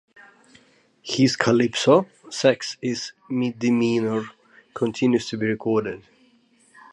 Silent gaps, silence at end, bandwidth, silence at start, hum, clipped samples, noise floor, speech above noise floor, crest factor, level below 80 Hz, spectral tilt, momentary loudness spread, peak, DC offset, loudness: none; 0.95 s; 11 kHz; 1.05 s; none; under 0.1%; -59 dBFS; 38 dB; 22 dB; -64 dBFS; -5 dB/octave; 14 LU; -2 dBFS; under 0.1%; -22 LUFS